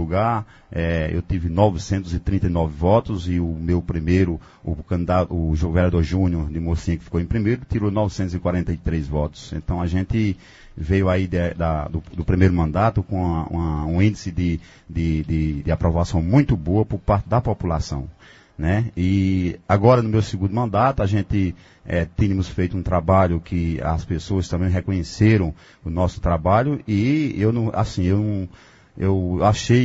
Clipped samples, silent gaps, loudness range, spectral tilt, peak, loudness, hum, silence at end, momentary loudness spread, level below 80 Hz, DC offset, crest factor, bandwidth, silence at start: under 0.1%; none; 3 LU; -8 dB/octave; 0 dBFS; -21 LUFS; none; 0 s; 8 LU; -32 dBFS; under 0.1%; 20 dB; 8 kHz; 0 s